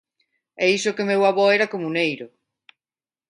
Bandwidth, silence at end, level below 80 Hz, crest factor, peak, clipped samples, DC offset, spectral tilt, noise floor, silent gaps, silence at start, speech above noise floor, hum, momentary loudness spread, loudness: 11 kHz; 1.05 s; -74 dBFS; 18 dB; -6 dBFS; under 0.1%; under 0.1%; -4 dB/octave; under -90 dBFS; none; 0.6 s; over 70 dB; none; 8 LU; -20 LUFS